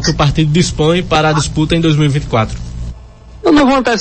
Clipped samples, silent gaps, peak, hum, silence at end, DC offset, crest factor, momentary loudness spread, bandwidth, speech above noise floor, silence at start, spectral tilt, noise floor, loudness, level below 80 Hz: under 0.1%; none; 0 dBFS; none; 0 s; under 0.1%; 12 dB; 13 LU; 8.8 kHz; 23 dB; 0 s; -5.5 dB/octave; -34 dBFS; -12 LUFS; -28 dBFS